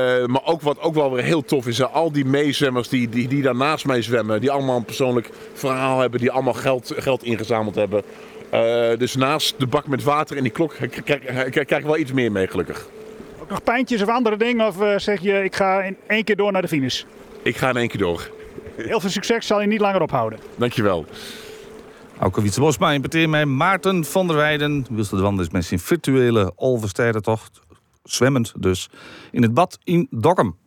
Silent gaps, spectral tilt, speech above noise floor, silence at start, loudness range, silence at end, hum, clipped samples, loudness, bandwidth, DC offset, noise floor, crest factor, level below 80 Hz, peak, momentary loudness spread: none; -5.5 dB/octave; 21 dB; 0 s; 3 LU; 0.1 s; none; under 0.1%; -20 LUFS; over 20 kHz; under 0.1%; -41 dBFS; 18 dB; -54 dBFS; -4 dBFS; 9 LU